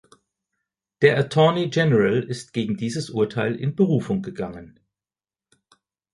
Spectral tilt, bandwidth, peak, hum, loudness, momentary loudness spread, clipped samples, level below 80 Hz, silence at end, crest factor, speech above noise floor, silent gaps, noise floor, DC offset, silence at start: -6.5 dB/octave; 11.5 kHz; -2 dBFS; none; -22 LUFS; 11 LU; under 0.1%; -58 dBFS; 1.45 s; 20 dB; over 69 dB; none; under -90 dBFS; under 0.1%; 1 s